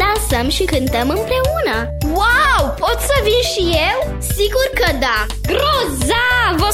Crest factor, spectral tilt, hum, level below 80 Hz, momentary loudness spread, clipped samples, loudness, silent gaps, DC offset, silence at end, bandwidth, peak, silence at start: 12 dB; -4 dB/octave; none; -24 dBFS; 5 LU; under 0.1%; -15 LUFS; none; under 0.1%; 0 s; 17 kHz; -2 dBFS; 0 s